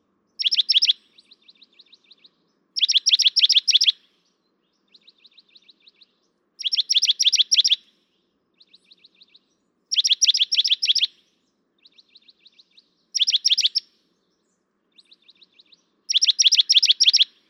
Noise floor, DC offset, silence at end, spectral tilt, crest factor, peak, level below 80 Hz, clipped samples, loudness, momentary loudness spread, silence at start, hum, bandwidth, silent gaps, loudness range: -71 dBFS; under 0.1%; 0.25 s; 7 dB/octave; 18 dB; -4 dBFS; under -90 dBFS; under 0.1%; -17 LUFS; 9 LU; 0.4 s; none; 17 kHz; none; 5 LU